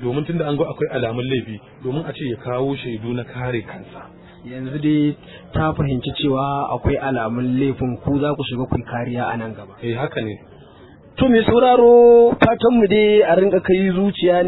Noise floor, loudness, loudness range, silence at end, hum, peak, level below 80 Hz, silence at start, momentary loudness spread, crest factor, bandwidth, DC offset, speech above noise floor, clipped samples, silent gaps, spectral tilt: -44 dBFS; -18 LUFS; 11 LU; 0 s; none; 0 dBFS; -42 dBFS; 0 s; 15 LU; 18 dB; 4.1 kHz; under 0.1%; 27 dB; under 0.1%; none; -10.5 dB/octave